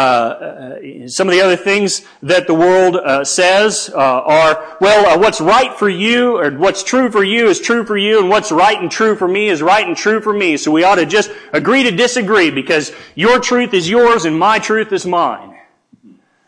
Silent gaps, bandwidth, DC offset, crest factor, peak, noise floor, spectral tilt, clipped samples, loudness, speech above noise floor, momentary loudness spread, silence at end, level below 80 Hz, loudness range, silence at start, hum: none; 10.5 kHz; under 0.1%; 12 dB; -2 dBFS; -47 dBFS; -3.5 dB/octave; under 0.1%; -12 LUFS; 34 dB; 6 LU; 0.95 s; -52 dBFS; 2 LU; 0 s; none